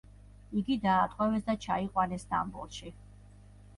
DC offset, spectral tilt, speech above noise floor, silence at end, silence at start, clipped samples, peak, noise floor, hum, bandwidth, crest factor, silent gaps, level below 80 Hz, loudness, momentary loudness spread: under 0.1%; -6 dB/octave; 23 dB; 0.7 s; 0.5 s; under 0.1%; -14 dBFS; -54 dBFS; 50 Hz at -50 dBFS; 11.5 kHz; 18 dB; none; -54 dBFS; -31 LUFS; 15 LU